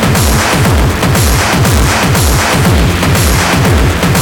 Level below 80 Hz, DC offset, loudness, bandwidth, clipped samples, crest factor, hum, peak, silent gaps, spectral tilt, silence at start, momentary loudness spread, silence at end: -16 dBFS; under 0.1%; -9 LUFS; 19.5 kHz; under 0.1%; 8 dB; none; 0 dBFS; none; -4.5 dB/octave; 0 s; 1 LU; 0 s